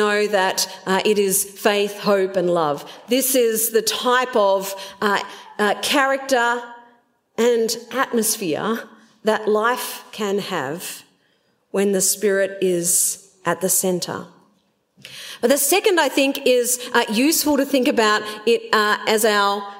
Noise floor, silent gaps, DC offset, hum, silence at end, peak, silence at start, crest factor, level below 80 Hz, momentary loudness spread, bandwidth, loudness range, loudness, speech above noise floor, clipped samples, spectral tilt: -64 dBFS; none; under 0.1%; none; 0 s; -2 dBFS; 0 s; 18 dB; -66 dBFS; 10 LU; 16.5 kHz; 4 LU; -19 LUFS; 44 dB; under 0.1%; -2.5 dB/octave